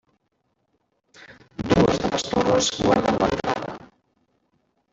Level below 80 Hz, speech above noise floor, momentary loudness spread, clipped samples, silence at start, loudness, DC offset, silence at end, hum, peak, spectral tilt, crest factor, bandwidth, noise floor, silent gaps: -46 dBFS; 51 dB; 16 LU; under 0.1%; 1.2 s; -21 LUFS; under 0.1%; 1.15 s; none; -4 dBFS; -4.5 dB/octave; 20 dB; 8 kHz; -72 dBFS; none